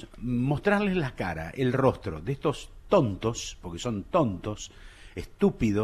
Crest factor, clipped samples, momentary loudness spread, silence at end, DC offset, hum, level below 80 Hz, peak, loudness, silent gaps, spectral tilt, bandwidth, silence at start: 18 dB; under 0.1%; 14 LU; 0 s; under 0.1%; none; -46 dBFS; -10 dBFS; -28 LUFS; none; -6.5 dB/octave; 13.5 kHz; 0 s